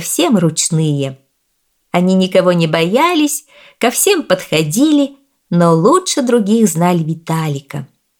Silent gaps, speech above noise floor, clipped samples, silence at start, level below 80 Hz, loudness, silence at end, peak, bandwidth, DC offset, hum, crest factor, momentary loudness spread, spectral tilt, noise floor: none; 52 dB; under 0.1%; 0 s; -60 dBFS; -13 LUFS; 0.35 s; 0 dBFS; 19 kHz; under 0.1%; none; 14 dB; 9 LU; -5 dB/octave; -65 dBFS